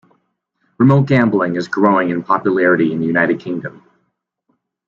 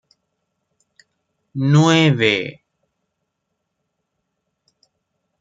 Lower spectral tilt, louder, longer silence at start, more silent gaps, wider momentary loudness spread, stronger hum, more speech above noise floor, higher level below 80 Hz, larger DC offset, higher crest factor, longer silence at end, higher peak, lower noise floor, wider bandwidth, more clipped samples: first, -8.5 dB/octave vs -5.5 dB/octave; about the same, -15 LUFS vs -15 LUFS; second, 0.8 s vs 1.55 s; neither; second, 9 LU vs 17 LU; neither; second, 55 dB vs 61 dB; first, -56 dBFS vs -64 dBFS; neither; second, 14 dB vs 20 dB; second, 1.2 s vs 2.9 s; about the same, -2 dBFS vs -2 dBFS; second, -69 dBFS vs -76 dBFS; about the same, 7.2 kHz vs 7.8 kHz; neither